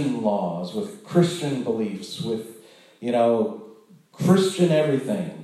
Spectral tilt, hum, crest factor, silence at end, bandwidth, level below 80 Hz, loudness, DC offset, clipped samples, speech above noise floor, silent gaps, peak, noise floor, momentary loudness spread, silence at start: -6.5 dB/octave; none; 18 dB; 0 s; 13 kHz; -70 dBFS; -23 LUFS; under 0.1%; under 0.1%; 27 dB; none; -6 dBFS; -50 dBFS; 12 LU; 0 s